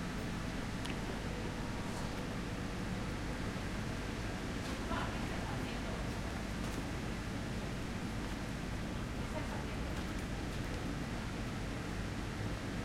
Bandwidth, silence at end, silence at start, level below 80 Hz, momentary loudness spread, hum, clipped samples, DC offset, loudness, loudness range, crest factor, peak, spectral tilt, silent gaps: 16.5 kHz; 0 s; 0 s; -46 dBFS; 1 LU; none; under 0.1%; under 0.1%; -41 LUFS; 1 LU; 16 dB; -22 dBFS; -5.5 dB/octave; none